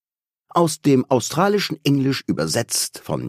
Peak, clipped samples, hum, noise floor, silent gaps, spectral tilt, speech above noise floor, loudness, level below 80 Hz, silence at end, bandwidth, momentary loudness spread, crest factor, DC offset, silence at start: -2 dBFS; under 0.1%; none; -78 dBFS; none; -4.5 dB/octave; 58 dB; -20 LUFS; -56 dBFS; 0 s; 15.5 kHz; 5 LU; 18 dB; under 0.1%; 0.55 s